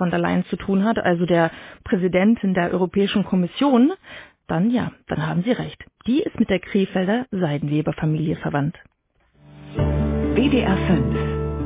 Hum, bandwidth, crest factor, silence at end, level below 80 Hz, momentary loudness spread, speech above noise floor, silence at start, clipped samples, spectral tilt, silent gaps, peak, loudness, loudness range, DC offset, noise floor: none; 4 kHz; 16 dB; 0 s; -36 dBFS; 8 LU; 42 dB; 0 s; under 0.1%; -11.5 dB/octave; none; -4 dBFS; -21 LUFS; 4 LU; under 0.1%; -62 dBFS